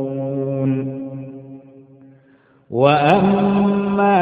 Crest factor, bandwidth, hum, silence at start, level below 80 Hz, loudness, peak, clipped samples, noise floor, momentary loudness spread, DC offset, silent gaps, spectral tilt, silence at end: 18 dB; 5 kHz; none; 0 s; -52 dBFS; -17 LUFS; 0 dBFS; under 0.1%; -53 dBFS; 17 LU; under 0.1%; none; -9 dB/octave; 0 s